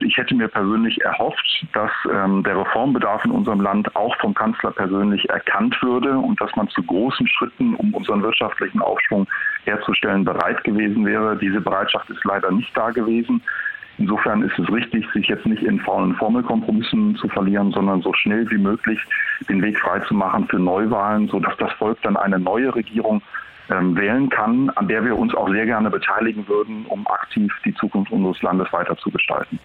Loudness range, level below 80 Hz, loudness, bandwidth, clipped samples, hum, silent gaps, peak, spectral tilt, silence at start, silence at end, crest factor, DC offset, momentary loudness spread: 1 LU; -56 dBFS; -19 LUFS; 4.5 kHz; under 0.1%; none; none; -2 dBFS; -8 dB/octave; 0 s; 0.05 s; 18 dB; under 0.1%; 4 LU